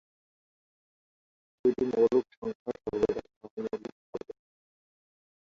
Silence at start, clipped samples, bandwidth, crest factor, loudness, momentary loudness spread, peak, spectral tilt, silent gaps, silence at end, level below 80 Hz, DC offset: 1.65 s; under 0.1%; 7.4 kHz; 20 dB; -31 LUFS; 17 LU; -14 dBFS; -7.5 dB/octave; 2.37-2.42 s, 2.55-2.66 s, 3.36-3.41 s, 3.51-3.57 s, 3.92-4.13 s; 1.25 s; -64 dBFS; under 0.1%